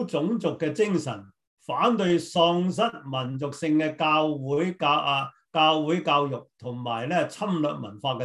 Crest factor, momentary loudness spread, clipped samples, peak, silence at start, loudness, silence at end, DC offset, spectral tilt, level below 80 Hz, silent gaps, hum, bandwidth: 18 dB; 10 LU; under 0.1%; -8 dBFS; 0 s; -25 LUFS; 0 s; under 0.1%; -5.5 dB/octave; -70 dBFS; 1.47-1.57 s; none; 12 kHz